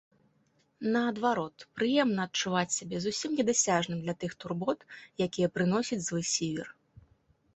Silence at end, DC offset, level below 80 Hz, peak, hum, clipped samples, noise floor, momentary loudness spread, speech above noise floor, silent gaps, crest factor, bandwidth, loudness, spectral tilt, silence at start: 0.85 s; under 0.1%; -68 dBFS; -12 dBFS; none; under 0.1%; -71 dBFS; 10 LU; 40 dB; none; 20 dB; 8.4 kHz; -30 LUFS; -4 dB/octave; 0.8 s